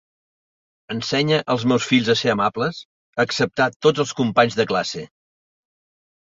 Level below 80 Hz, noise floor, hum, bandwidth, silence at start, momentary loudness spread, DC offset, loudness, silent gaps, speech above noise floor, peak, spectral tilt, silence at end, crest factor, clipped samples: -58 dBFS; under -90 dBFS; none; 7.8 kHz; 0.9 s; 10 LU; under 0.1%; -20 LUFS; 2.85-3.13 s, 3.76-3.80 s; over 70 dB; -2 dBFS; -5 dB/octave; 1.25 s; 20 dB; under 0.1%